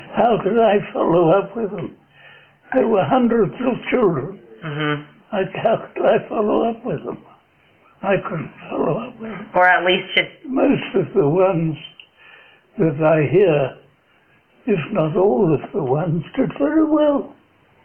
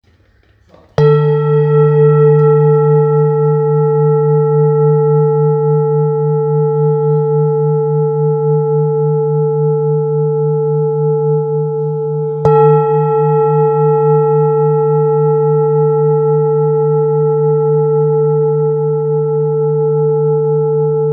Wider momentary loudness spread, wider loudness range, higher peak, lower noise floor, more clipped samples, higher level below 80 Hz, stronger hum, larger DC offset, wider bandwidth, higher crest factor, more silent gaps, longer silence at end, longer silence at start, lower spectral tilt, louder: first, 13 LU vs 4 LU; about the same, 4 LU vs 3 LU; about the same, 0 dBFS vs 0 dBFS; first, -57 dBFS vs -50 dBFS; neither; about the same, -52 dBFS vs -54 dBFS; neither; neither; first, 4 kHz vs 3.5 kHz; first, 18 dB vs 12 dB; neither; first, 0.5 s vs 0 s; second, 0 s vs 1 s; second, -9.5 dB/octave vs -12 dB/octave; second, -19 LUFS vs -12 LUFS